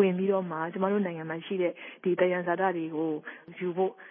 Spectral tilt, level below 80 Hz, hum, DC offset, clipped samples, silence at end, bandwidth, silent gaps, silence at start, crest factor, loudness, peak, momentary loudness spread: -11 dB/octave; -82 dBFS; none; under 0.1%; under 0.1%; 0 s; 3.6 kHz; none; 0 s; 18 dB; -30 LUFS; -12 dBFS; 8 LU